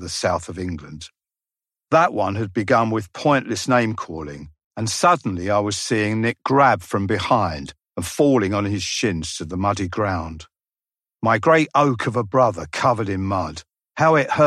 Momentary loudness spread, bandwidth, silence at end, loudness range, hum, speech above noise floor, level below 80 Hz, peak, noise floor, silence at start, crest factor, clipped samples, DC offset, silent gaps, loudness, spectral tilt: 16 LU; 14 kHz; 0 s; 3 LU; none; over 70 dB; -50 dBFS; -2 dBFS; under -90 dBFS; 0 s; 18 dB; under 0.1%; under 0.1%; 4.66-4.71 s; -20 LUFS; -5 dB/octave